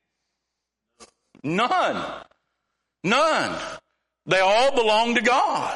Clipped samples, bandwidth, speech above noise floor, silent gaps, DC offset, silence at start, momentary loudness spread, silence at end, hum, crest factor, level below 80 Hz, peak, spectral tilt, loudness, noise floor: under 0.1%; 11.5 kHz; 61 dB; none; under 0.1%; 1 s; 16 LU; 0 s; none; 18 dB; -60 dBFS; -6 dBFS; -3.5 dB/octave; -21 LUFS; -82 dBFS